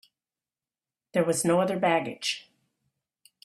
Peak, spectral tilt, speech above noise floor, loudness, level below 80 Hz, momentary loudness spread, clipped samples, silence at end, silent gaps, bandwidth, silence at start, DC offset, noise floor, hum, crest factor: -10 dBFS; -4 dB/octave; over 64 dB; -26 LUFS; -72 dBFS; 7 LU; under 0.1%; 1.05 s; none; 15 kHz; 1.15 s; under 0.1%; under -90 dBFS; none; 20 dB